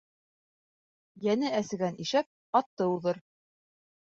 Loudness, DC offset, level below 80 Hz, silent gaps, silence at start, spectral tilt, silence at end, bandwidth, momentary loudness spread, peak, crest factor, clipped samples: -30 LUFS; under 0.1%; -76 dBFS; 2.26-2.53 s, 2.66-2.77 s; 1.2 s; -5.5 dB/octave; 0.95 s; 8 kHz; 6 LU; -12 dBFS; 22 dB; under 0.1%